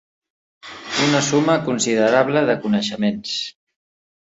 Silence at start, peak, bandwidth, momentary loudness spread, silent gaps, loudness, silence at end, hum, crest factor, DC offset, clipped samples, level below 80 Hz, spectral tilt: 0.65 s; -2 dBFS; 8 kHz; 10 LU; none; -19 LUFS; 0.85 s; none; 18 dB; under 0.1%; under 0.1%; -60 dBFS; -4 dB/octave